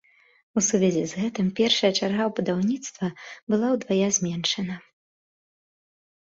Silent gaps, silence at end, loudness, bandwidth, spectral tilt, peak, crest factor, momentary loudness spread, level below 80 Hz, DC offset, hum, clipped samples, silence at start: 3.42-3.47 s; 1.55 s; -24 LUFS; 7.8 kHz; -4 dB/octave; -8 dBFS; 18 dB; 11 LU; -64 dBFS; under 0.1%; none; under 0.1%; 0.55 s